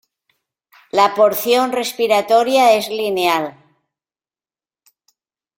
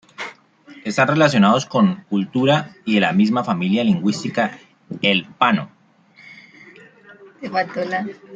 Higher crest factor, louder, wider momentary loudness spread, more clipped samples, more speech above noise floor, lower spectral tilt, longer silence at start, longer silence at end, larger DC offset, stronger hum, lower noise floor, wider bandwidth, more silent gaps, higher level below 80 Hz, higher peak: about the same, 18 dB vs 20 dB; first, -15 LUFS vs -18 LUFS; second, 8 LU vs 16 LU; neither; first, over 75 dB vs 34 dB; second, -3 dB/octave vs -6 dB/octave; first, 0.95 s vs 0.2 s; first, 2.05 s vs 0 s; neither; neither; first, under -90 dBFS vs -52 dBFS; first, 16.5 kHz vs 7.8 kHz; neither; about the same, -66 dBFS vs -62 dBFS; about the same, 0 dBFS vs 0 dBFS